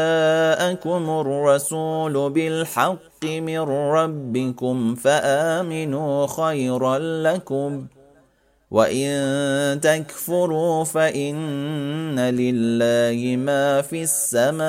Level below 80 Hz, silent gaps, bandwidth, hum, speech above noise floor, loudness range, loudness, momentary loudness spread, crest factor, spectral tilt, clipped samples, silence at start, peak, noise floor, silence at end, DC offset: -64 dBFS; none; 16 kHz; none; 39 dB; 2 LU; -21 LUFS; 7 LU; 18 dB; -4.5 dB/octave; under 0.1%; 0 s; -2 dBFS; -60 dBFS; 0 s; under 0.1%